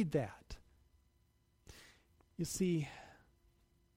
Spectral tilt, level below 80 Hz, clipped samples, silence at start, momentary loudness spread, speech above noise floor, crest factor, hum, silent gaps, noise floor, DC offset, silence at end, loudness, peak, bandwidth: -6 dB/octave; -64 dBFS; under 0.1%; 0 s; 23 LU; 37 dB; 20 dB; none; none; -74 dBFS; under 0.1%; 0.85 s; -39 LUFS; -22 dBFS; 16 kHz